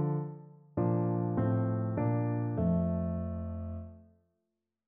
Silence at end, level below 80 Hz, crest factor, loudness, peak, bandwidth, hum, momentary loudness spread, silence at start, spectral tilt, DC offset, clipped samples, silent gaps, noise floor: 0.85 s; -52 dBFS; 14 dB; -33 LUFS; -18 dBFS; 2.8 kHz; none; 12 LU; 0 s; -12 dB/octave; under 0.1%; under 0.1%; none; -85 dBFS